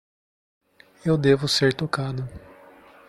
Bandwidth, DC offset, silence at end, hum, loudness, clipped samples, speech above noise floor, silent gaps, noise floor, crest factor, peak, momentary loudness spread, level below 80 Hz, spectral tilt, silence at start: 14 kHz; under 0.1%; 0.7 s; none; -23 LUFS; under 0.1%; 28 dB; none; -50 dBFS; 20 dB; -6 dBFS; 13 LU; -54 dBFS; -5.5 dB/octave; 1.05 s